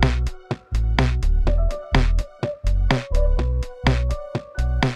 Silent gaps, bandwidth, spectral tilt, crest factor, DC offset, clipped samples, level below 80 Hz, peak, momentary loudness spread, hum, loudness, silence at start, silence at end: none; 9.4 kHz; -6.5 dB/octave; 18 dB; under 0.1%; under 0.1%; -22 dBFS; -2 dBFS; 7 LU; none; -23 LUFS; 0 s; 0 s